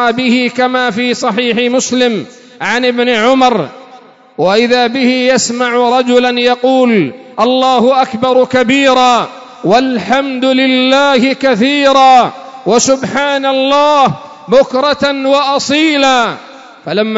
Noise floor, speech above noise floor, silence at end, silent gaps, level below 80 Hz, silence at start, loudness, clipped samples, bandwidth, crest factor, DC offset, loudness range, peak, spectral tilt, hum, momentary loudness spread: -38 dBFS; 28 dB; 0 s; none; -52 dBFS; 0 s; -10 LUFS; under 0.1%; 8 kHz; 10 dB; 0.1%; 3 LU; 0 dBFS; -3.5 dB/octave; none; 7 LU